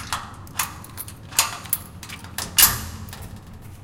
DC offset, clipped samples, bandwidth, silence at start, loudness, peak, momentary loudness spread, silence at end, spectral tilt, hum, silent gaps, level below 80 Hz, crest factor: under 0.1%; under 0.1%; 17 kHz; 0 s; -21 LUFS; 0 dBFS; 23 LU; 0 s; -0.5 dB/octave; none; none; -44 dBFS; 26 dB